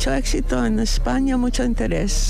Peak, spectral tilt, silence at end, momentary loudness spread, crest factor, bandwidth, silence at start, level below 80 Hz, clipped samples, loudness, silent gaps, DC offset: -12 dBFS; -4.5 dB/octave; 0 s; 2 LU; 8 dB; 13.5 kHz; 0 s; -22 dBFS; under 0.1%; -21 LUFS; none; under 0.1%